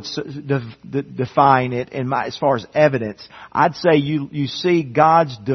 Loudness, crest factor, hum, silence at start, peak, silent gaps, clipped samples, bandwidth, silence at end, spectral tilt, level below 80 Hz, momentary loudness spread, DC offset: -18 LUFS; 18 dB; none; 0 s; 0 dBFS; none; under 0.1%; 6.4 kHz; 0 s; -7 dB/octave; -58 dBFS; 13 LU; under 0.1%